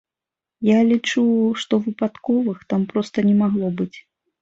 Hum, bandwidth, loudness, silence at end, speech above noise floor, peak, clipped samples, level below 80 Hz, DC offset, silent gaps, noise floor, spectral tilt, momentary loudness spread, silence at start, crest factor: none; 7.8 kHz; -20 LUFS; 0.4 s; 69 dB; -6 dBFS; under 0.1%; -62 dBFS; under 0.1%; none; -88 dBFS; -6.5 dB/octave; 8 LU; 0.6 s; 14 dB